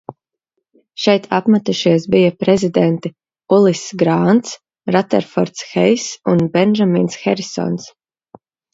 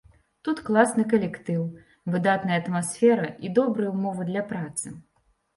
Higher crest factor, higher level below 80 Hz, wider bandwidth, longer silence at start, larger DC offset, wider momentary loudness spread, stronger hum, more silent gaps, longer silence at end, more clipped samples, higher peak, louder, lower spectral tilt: about the same, 16 dB vs 20 dB; first, -56 dBFS vs -64 dBFS; second, 7.8 kHz vs 11.5 kHz; first, 1 s vs 0.45 s; neither; about the same, 9 LU vs 11 LU; neither; neither; first, 0.85 s vs 0.55 s; neither; first, 0 dBFS vs -6 dBFS; first, -15 LUFS vs -25 LUFS; about the same, -6 dB/octave vs -6 dB/octave